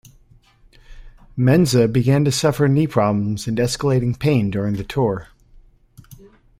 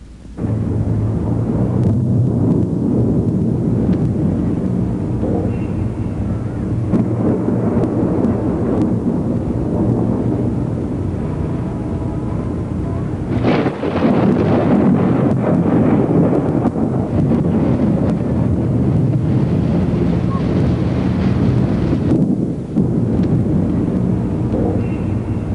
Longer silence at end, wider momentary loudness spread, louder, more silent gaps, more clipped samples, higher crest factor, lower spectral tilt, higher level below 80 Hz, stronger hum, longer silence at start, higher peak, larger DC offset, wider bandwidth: first, 0.45 s vs 0 s; about the same, 7 LU vs 7 LU; about the same, -18 LUFS vs -17 LUFS; neither; neither; first, 18 dB vs 12 dB; second, -6.5 dB/octave vs -10 dB/octave; second, -44 dBFS vs -32 dBFS; neither; first, 0.9 s vs 0 s; about the same, -2 dBFS vs -4 dBFS; second, under 0.1% vs 0.3%; first, 15.5 kHz vs 10.5 kHz